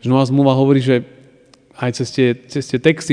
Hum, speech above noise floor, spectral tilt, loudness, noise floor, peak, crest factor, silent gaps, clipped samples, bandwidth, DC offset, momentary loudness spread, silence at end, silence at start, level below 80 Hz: none; 34 dB; -6.5 dB/octave; -16 LUFS; -49 dBFS; 0 dBFS; 16 dB; none; under 0.1%; 10 kHz; under 0.1%; 10 LU; 0 s; 0 s; -58 dBFS